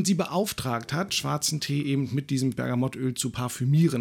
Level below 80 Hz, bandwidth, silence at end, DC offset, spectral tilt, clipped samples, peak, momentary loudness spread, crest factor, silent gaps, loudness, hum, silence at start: -58 dBFS; 18 kHz; 0 s; under 0.1%; -5 dB/octave; under 0.1%; -10 dBFS; 5 LU; 16 dB; none; -27 LUFS; none; 0 s